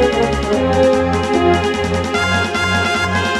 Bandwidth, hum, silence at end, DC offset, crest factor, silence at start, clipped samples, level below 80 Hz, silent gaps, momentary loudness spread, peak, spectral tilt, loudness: 13.5 kHz; none; 0 s; under 0.1%; 14 dB; 0 s; under 0.1%; -32 dBFS; none; 3 LU; -2 dBFS; -5 dB/octave; -15 LUFS